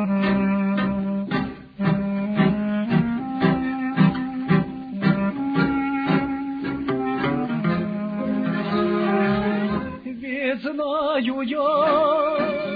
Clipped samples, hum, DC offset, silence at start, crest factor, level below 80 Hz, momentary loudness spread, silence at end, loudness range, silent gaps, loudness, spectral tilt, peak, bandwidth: under 0.1%; none; under 0.1%; 0 s; 16 dB; -50 dBFS; 7 LU; 0 s; 2 LU; none; -23 LUFS; -10 dB/octave; -6 dBFS; 5 kHz